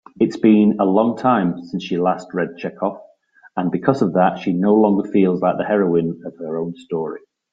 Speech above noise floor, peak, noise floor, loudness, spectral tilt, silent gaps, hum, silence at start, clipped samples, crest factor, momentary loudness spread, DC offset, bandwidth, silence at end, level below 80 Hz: 25 dB; -2 dBFS; -42 dBFS; -18 LUFS; -8.5 dB/octave; none; none; 0.2 s; under 0.1%; 18 dB; 12 LU; under 0.1%; 7.6 kHz; 0.35 s; -60 dBFS